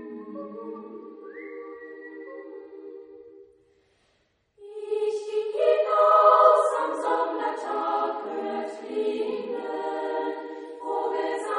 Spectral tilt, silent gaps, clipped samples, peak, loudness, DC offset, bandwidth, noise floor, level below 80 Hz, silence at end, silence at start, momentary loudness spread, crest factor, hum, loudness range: -4 dB/octave; none; under 0.1%; -4 dBFS; -24 LUFS; under 0.1%; 10 kHz; -69 dBFS; -82 dBFS; 0 s; 0 s; 23 LU; 22 dB; none; 21 LU